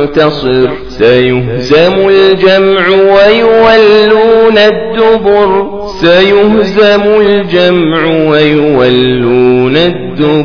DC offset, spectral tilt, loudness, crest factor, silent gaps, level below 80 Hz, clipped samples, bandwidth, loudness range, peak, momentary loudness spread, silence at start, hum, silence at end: under 0.1%; -7 dB/octave; -6 LUFS; 6 dB; none; -34 dBFS; 4%; 5.4 kHz; 2 LU; 0 dBFS; 6 LU; 0 s; none; 0 s